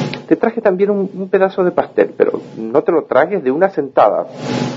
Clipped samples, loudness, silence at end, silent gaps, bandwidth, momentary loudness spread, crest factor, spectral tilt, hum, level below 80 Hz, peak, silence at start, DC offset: under 0.1%; -15 LUFS; 0 s; none; 7.8 kHz; 6 LU; 14 dB; -7 dB/octave; none; -62 dBFS; 0 dBFS; 0 s; under 0.1%